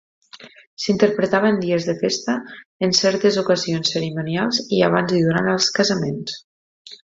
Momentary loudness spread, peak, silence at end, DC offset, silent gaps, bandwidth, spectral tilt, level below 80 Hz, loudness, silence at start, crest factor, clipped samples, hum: 9 LU; -2 dBFS; 0.15 s; under 0.1%; 0.67-0.77 s, 2.66-2.80 s, 6.44-6.85 s; 7.8 kHz; -4.5 dB/octave; -60 dBFS; -19 LUFS; 0.35 s; 18 dB; under 0.1%; none